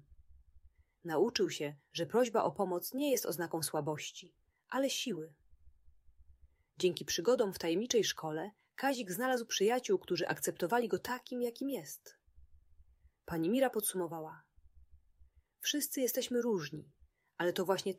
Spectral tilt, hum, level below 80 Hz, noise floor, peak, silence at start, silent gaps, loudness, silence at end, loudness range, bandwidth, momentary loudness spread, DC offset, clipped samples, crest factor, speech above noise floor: -3.5 dB/octave; none; -70 dBFS; -66 dBFS; -18 dBFS; 0.1 s; none; -35 LUFS; 0 s; 5 LU; 16 kHz; 11 LU; under 0.1%; under 0.1%; 18 dB; 31 dB